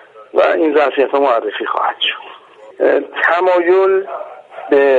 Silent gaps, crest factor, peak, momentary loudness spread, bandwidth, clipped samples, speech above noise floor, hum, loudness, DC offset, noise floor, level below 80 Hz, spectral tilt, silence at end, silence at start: none; 14 dB; 0 dBFS; 14 LU; 7.2 kHz; under 0.1%; 25 dB; none; -14 LUFS; under 0.1%; -38 dBFS; -66 dBFS; -4.5 dB/octave; 0 s; 0.15 s